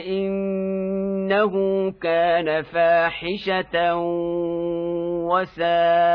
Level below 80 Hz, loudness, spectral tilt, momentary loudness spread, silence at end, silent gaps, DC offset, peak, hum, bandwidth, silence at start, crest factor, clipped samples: -54 dBFS; -22 LUFS; -8.5 dB/octave; 7 LU; 0 s; none; under 0.1%; -6 dBFS; none; 5.4 kHz; 0 s; 14 dB; under 0.1%